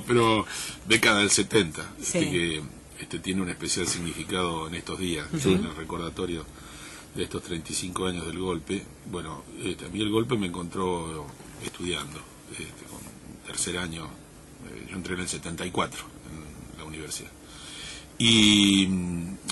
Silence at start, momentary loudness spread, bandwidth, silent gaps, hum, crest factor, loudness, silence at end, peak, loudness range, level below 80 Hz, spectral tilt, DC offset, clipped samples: 0 s; 21 LU; 12 kHz; none; none; 20 dB; -26 LUFS; 0 s; -10 dBFS; 10 LU; -50 dBFS; -3.5 dB/octave; under 0.1%; under 0.1%